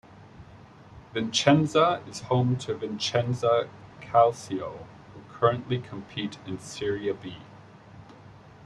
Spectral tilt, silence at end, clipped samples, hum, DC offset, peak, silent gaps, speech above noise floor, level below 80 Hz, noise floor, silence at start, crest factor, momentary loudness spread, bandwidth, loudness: -5.5 dB/octave; 0 s; under 0.1%; none; under 0.1%; -4 dBFS; none; 24 dB; -60 dBFS; -50 dBFS; 0.1 s; 24 dB; 19 LU; 11.5 kHz; -26 LUFS